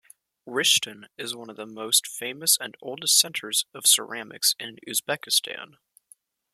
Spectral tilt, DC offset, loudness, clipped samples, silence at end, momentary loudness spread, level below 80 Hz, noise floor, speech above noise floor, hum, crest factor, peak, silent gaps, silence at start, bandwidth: 0.5 dB/octave; under 0.1%; -22 LUFS; under 0.1%; 0.9 s; 16 LU; -78 dBFS; -59 dBFS; 33 dB; none; 22 dB; -4 dBFS; none; 0.45 s; 15.5 kHz